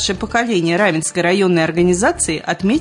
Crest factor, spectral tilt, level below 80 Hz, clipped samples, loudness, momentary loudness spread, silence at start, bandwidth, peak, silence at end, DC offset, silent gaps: 12 dB; -4 dB/octave; -42 dBFS; under 0.1%; -16 LUFS; 4 LU; 0 s; 11 kHz; -4 dBFS; 0 s; under 0.1%; none